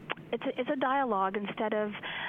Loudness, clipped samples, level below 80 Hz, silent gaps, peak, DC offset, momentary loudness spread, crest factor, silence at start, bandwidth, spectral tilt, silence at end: -32 LUFS; under 0.1%; -70 dBFS; none; -12 dBFS; under 0.1%; 7 LU; 20 dB; 0 s; 4.2 kHz; -7.5 dB/octave; 0 s